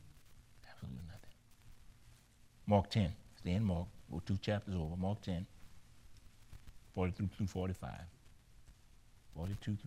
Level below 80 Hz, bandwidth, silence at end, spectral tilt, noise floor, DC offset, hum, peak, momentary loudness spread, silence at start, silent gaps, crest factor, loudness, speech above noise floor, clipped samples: -56 dBFS; 13 kHz; 0 s; -7.5 dB/octave; -64 dBFS; under 0.1%; none; -18 dBFS; 22 LU; 0 s; none; 24 dB; -40 LUFS; 26 dB; under 0.1%